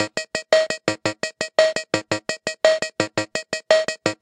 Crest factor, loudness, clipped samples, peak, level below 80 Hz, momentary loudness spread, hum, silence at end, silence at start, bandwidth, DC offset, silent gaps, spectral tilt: 22 dB; -22 LUFS; under 0.1%; 0 dBFS; -64 dBFS; 8 LU; none; 0.05 s; 0 s; 11 kHz; under 0.1%; none; -3 dB/octave